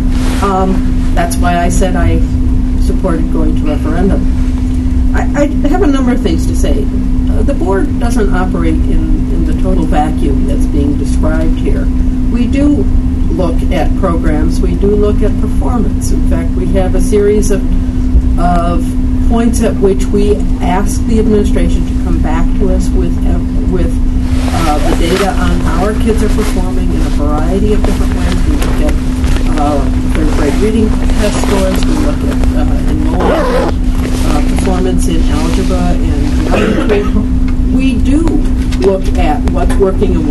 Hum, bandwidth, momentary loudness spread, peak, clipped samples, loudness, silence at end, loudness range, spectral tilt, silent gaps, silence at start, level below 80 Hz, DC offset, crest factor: none; 12.5 kHz; 3 LU; 0 dBFS; under 0.1%; -12 LUFS; 0 s; 1 LU; -7 dB/octave; none; 0 s; -12 dBFS; under 0.1%; 10 dB